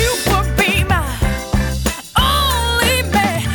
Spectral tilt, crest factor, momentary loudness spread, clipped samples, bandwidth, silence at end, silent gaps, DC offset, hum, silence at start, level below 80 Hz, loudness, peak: -4 dB/octave; 12 dB; 6 LU; under 0.1%; 19.5 kHz; 0 s; none; under 0.1%; none; 0 s; -22 dBFS; -16 LUFS; -4 dBFS